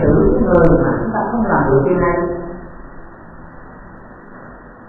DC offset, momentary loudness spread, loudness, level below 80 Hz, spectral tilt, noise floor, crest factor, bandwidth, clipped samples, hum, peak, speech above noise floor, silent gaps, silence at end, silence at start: under 0.1%; 24 LU; -15 LUFS; -28 dBFS; -12 dB/octave; -37 dBFS; 16 dB; 3 kHz; under 0.1%; none; 0 dBFS; 24 dB; none; 0 s; 0 s